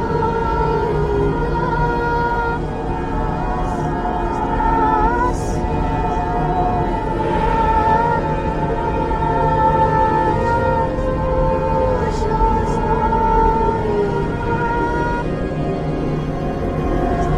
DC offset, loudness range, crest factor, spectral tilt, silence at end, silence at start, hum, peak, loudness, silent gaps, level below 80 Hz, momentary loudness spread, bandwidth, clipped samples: under 0.1%; 3 LU; 14 dB; -8 dB/octave; 0 s; 0 s; none; -4 dBFS; -18 LUFS; none; -26 dBFS; 6 LU; 10.5 kHz; under 0.1%